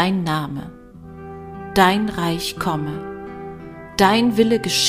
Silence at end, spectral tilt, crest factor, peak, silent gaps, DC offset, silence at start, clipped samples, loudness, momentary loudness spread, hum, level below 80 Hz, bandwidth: 0 s; -4.5 dB/octave; 18 dB; -2 dBFS; none; under 0.1%; 0 s; under 0.1%; -19 LUFS; 20 LU; none; -46 dBFS; 15.5 kHz